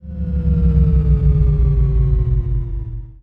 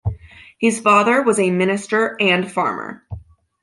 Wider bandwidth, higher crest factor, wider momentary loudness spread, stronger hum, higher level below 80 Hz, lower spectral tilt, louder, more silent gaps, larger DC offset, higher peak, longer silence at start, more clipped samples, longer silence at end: second, 2.6 kHz vs 11.5 kHz; about the same, 12 dB vs 16 dB; second, 9 LU vs 22 LU; neither; first, -16 dBFS vs -42 dBFS; first, -12 dB/octave vs -4.5 dB/octave; about the same, -17 LUFS vs -17 LUFS; neither; neither; about the same, -2 dBFS vs -2 dBFS; about the same, 0.05 s vs 0.05 s; neither; second, 0.05 s vs 0.45 s